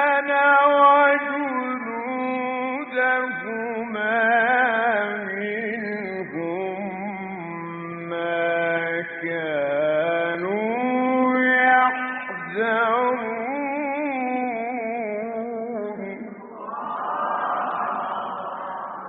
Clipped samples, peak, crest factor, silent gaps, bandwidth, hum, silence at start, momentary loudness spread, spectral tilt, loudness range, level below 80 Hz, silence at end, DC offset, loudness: under 0.1%; -6 dBFS; 18 dB; none; 4.4 kHz; none; 0 s; 14 LU; -2.5 dB/octave; 7 LU; -72 dBFS; 0 s; under 0.1%; -23 LUFS